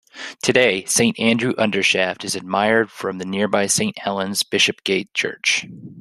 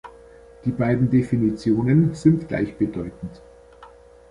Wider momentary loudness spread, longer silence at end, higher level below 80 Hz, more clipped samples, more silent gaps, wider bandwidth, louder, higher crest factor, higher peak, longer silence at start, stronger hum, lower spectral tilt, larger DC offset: second, 8 LU vs 14 LU; second, 0 s vs 0.45 s; second, -62 dBFS vs -48 dBFS; neither; neither; first, 13 kHz vs 11 kHz; about the same, -19 LUFS vs -21 LUFS; about the same, 18 dB vs 18 dB; about the same, -2 dBFS vs -4 dBFS; about the same, 0.15 s vs 0.05 s; neither; second, -2.5 dB/octave vs -9 dB/octave; neither